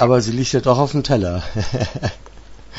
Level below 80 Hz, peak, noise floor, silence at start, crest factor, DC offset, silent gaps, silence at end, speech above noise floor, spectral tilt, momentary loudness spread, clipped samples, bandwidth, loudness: -36 dBFS; -2 dBFS; -37 dBFS; 0 s; 18 dB; under 0.1%; none; 0 s; 20 dB; -6 dB/octave; 8 LU; under 0.1%; 8 kHz; -19 LUFS